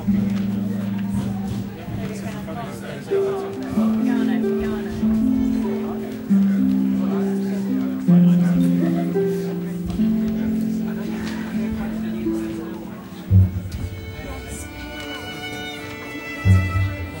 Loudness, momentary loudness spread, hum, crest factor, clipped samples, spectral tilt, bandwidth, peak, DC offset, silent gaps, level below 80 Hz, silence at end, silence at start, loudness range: -22 LUFS; 13 LU; none; 18 dB; under 0.1%; -7.5 dB/octave; 16.5 kHz; -4 dBFS; under 0.1%; none; -42 dBFS; 0 s; 0 s; 6 LU